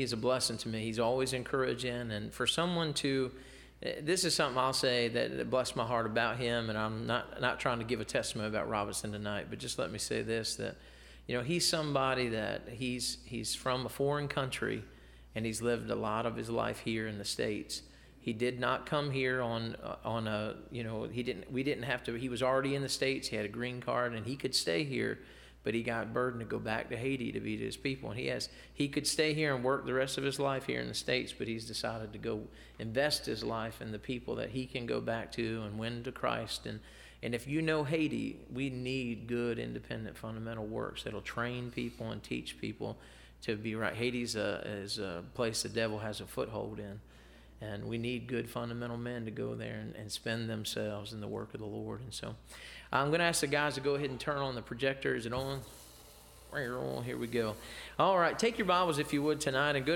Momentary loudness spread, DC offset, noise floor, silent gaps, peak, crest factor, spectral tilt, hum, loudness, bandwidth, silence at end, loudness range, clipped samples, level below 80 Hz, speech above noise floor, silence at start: 11 LU; under 0.1%; -56 dBFS; none; -14 dBFS; 22 dB; -4 dB/octave; none; -35 LUFS; 17 kHz; 0 s; 6 LU; under 0.1%; -58 dBFS; 21 dB; 0 s